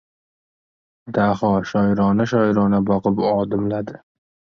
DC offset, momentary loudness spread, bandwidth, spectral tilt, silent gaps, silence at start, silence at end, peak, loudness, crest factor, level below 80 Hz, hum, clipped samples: under 0.1%; 7 LU; 6.6 kHz; -8.5 dB/octave; none; 1.05 s; 0.65 s; -6 dBFS; -19 LUFS; 14 dB; -50 dBFS; none; under 0.1%